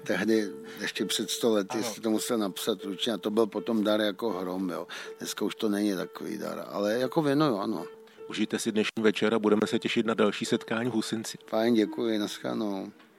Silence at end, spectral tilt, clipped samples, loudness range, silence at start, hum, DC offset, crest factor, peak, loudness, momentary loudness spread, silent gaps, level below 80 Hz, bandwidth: 0.15 s; -4.5 dB/octave; under 0.1%; 3 LU; 0 s; none; under 0.1%; 20 dB; -10 dBFS; -29 LUFS; 10 LU; none; -80 dBFS; 16.5 kHz